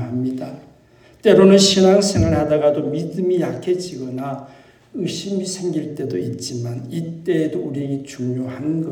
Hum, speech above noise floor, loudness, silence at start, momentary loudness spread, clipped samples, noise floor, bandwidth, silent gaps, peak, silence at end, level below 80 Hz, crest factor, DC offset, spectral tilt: none; 32 dB; -19 LUFS; 0 s; 15 LU; under 0.1%; -50 dBFS; 18.5 kHz; none; -2 dBFS; 0 s; -46 dBFS; 18 dB; under 0.1%; -5.5 dB/octave